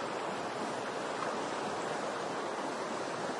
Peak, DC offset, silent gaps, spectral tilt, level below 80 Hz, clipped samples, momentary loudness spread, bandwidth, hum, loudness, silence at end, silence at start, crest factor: -22 dBFS; under 0.1%; none; -3.5 dB/octave; -82 dBFS; under 0.1%; 1 LU; 11.5 kHz; none; -37 LUFS; 0 s; 0 s; 14 dB